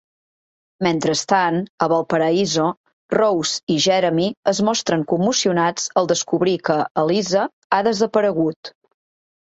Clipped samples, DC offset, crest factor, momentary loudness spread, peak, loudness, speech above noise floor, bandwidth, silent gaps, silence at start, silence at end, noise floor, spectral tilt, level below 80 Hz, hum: under 0.1%; under 0.1%; 18 dB; 4 LU; -2 dBFS; -19 LUFS; over 71 dB; 8.2 kHz; 1.69-1.78 s, 2.77-2.84 s, 2.93-3.09 s, 3.63-3.67 s, 4.37-4.43 s, 6.91-6.95 s, 7.53-7.70 s, 8.56-8.63 s; 0.8 s; 0.85 s; under -90 dBFS; -4 dB/octave; -62 dBFS; none